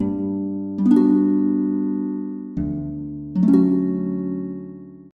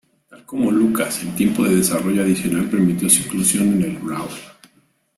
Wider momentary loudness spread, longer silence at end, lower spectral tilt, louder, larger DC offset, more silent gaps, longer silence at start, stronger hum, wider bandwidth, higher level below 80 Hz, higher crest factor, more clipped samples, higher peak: about the same, 14 LU vs 12 LU; second, 0.1 s vs 0.65 s; first, -11 dB/octave vs -4.5 dB/octave; second, -21 LUFS vs -18 LUFS; neither; neither; second, 0 s vs 0.3 s; neither; second, 4.4 kHz vs 15.5 kHz; about the same, -48 dBFS vs -52 dBFS; about the same, 16 dB vs 20 dB; neither; second, -6 dBFS vs 0 dBFS